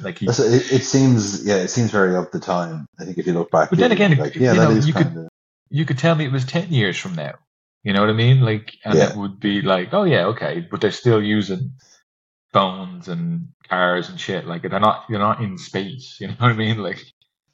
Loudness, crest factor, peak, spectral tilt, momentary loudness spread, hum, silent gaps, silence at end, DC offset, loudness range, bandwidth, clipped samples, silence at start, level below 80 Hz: -19 LUFS; 18 dB; -2 dBFS; -6 dB/octave; 13 LU; none; 2.88-2.93 s, 5.29-5.66 s, 7.47-7.81 s, 12.03-12.49 s, 13.54-13.60 s; 0.5 s; under 0.1%; 4 LU; 7.8 kHz; under 0.1%; 0 s; -60 dBFS